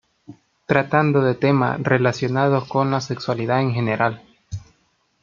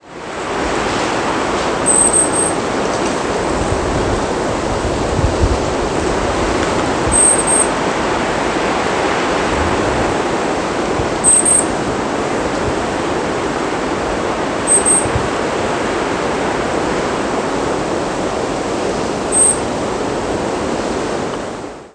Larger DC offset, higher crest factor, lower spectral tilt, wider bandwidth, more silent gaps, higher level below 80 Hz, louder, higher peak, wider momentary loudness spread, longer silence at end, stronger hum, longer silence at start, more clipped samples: neither; about the same, 20 dB vs 16 dB; first, -7 dB/octave vs -3 dB/octave; second, 7.4 kHz vs 11 kHz; neither; second, -56 dBFS vs -32 dBFS; second, -20 LUFS vs -15 LUFS; about the same, 0 dBFS vs 0 dBFS; first, 18 LU vs 9 LU; first, 0.65 s vs 0.05 s; neither; first, 0.3 s vs 0.05 s; neither